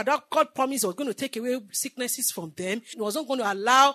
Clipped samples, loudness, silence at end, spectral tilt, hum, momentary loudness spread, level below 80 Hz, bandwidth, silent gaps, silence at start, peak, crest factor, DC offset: under 0.1%; -26 LUFS; 0 s; -2 dB/octave; none; 8 LU; -82 dBFS; 13.5 kHz; none; 0 s; -4 dBFS; 22 dB; under 0.1%